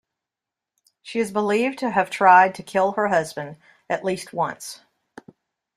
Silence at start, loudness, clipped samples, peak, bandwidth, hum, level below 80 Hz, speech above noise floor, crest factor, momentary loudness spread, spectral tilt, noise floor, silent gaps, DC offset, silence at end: 1.05 s; -21 LUFS; under 0.1%; -2 dBFS; 14.5 kHz; none; -68 dBFS; 67 dB; 20 dB; 18 LU; -4.5 dB/octave; -87 dBFS; none; under 0.1%; 1 s